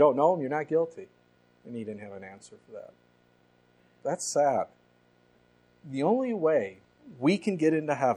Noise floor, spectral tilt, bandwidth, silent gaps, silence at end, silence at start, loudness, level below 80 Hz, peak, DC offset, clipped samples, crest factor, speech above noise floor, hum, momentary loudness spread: -64 dBFS; -5.5 dB/octave; 13 kHz; none; 0 s; 0 s; -28 LUFS; -76 dBFS; -10 dBFS; under 0.1%; under 0.1%; 20 dB; 37 dB; 60 Hz at -65 dBFS; 21 LU